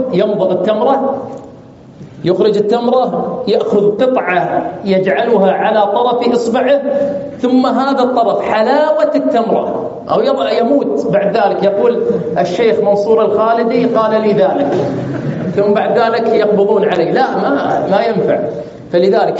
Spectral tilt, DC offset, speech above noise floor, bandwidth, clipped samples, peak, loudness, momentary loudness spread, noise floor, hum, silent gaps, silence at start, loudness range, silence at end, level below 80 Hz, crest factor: -5 dB/octave; under 0.1%; 24 dB; 8 kHz; under 0.1%; 0 dBFS; -13 LUFS; 6 LU; -36 dBFS; none; none; 0 s; 1 LU; 0 s; -54 dBFS; 12 dB